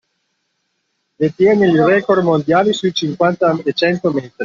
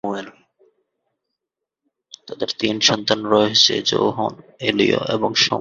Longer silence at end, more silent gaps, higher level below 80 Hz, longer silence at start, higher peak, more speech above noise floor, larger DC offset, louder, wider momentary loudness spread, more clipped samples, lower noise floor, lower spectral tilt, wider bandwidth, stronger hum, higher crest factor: about the same, 0 s vs 0 s; neither; about the same, -56 dBFS vs -60 dBFS; first, 1.2 s vs 0.05 s; about the same, -2 dBFS vs 0 dBFS; second, 55 dB vs 64 dB; neither; first, -15 LUFS vs -18 LUFS; second, 7 LU vs 13 LU; neither; second, -69 dBFS vs -83 dBFS; first, -6.5 dB/octave vs -3 dB/octave; about the same, 7.4 kHz vs 7.6 kHz; neither; second, 14 dB vs 20 dB